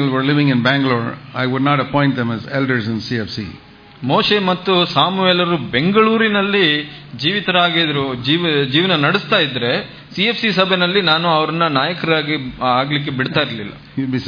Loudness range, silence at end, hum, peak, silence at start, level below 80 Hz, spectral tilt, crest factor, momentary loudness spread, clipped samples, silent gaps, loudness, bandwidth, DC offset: 3 LU; 0 s; none; 0 dBFS; 0 s; -52 dBFS; -7 dB/octave; 16 dB; 8 LU; under 0.1%; none; -16 LUFS; 5.2 kHz; under 0.1%